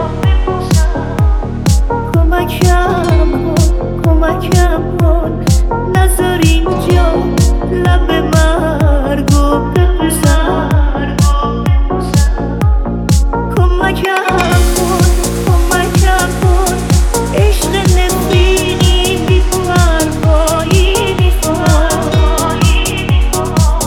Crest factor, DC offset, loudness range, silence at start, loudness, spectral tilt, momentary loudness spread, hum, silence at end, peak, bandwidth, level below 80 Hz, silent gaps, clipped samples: 10 dB; under 0.1%; 1 LU; 0 s; -12 LUFS; -5.5 dB/octave; 3 LU; none; 0 s; 0 dBFS; 17.5 kHz; -14 dBFS; none; under 0.1%